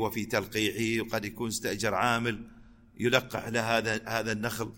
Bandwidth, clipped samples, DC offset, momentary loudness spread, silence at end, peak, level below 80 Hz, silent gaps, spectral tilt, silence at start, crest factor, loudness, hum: 17 kHz; under 0.1%; under 0.1%; 6 LU; 0 s; -8 dBFS; -56 dBFS; none; -4 dB/octave; 0 s; 22 dB; -30 LUFS; none